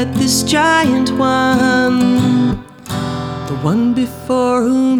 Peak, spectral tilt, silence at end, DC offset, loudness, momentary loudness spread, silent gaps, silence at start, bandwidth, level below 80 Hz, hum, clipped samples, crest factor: -2 dBFS; -5 dB/octave; 0 s; under 0.1%; -14 LUFS; 10 LU; none; 0 s; 17 kHz; -42 dBFS; none; under 0.1%; 12 dB